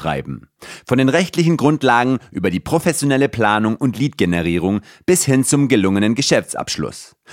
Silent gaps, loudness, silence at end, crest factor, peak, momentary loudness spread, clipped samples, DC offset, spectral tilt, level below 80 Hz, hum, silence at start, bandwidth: none; -17 LUFS; 0 s; 16 dB; 0 dBFS; 10 LU; under 0.1%; under 0.1%; -5 dB/octave; -46 dBFS; none; 0 s; 16.5 kHz